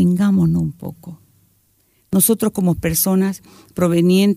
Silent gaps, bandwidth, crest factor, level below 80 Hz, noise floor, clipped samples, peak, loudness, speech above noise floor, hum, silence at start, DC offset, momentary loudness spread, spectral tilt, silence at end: none; 16 kHz; 16 dB; -44 dBFS; -60 dBFS; under 0.1%; -2 dBFS; -17 LUFS; 44 dB; none; 0 s; under 0.1%; 18 LU; -5.5 dB/octave; 0 s